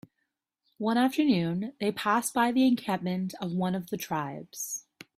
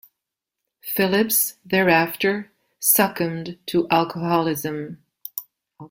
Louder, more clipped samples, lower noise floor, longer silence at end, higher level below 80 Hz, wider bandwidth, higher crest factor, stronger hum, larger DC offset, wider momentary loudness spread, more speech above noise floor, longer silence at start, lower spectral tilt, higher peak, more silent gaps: second, -29 LUFS vs -20 LUFS; neither; about the same, -81 dBFS vs -84 dBFS; first, 0.35 s vs 0.05 s; second, -70 dBFS vs -62 dBFS; about the same, 16 kHz vs 16.5 kHz; about the same, 18 dB vs 20 dB; neither; neither; second, 10 LU vs 16 LU; second, 54 dB vs 63 dB; about the same, 0.8 s vs 0.85 s; first, -5 dB/octave vs -3.5 dB/octave; second, -12 dBFS vs -4 dBFS; neither